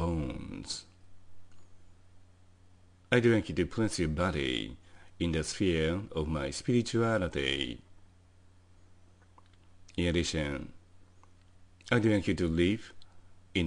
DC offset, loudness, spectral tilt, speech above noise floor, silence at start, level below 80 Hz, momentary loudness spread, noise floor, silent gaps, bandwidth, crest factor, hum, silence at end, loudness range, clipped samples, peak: under 0.1%; -31 LUFS; -5.5 dB/octave; 29 dB; 0 s; -50 dBFS; 13 LU; -59 dBFS; none; 10.5 kHz; 24 dB; none; 0 s; 6 LU; under 0.1%; -8 dBFS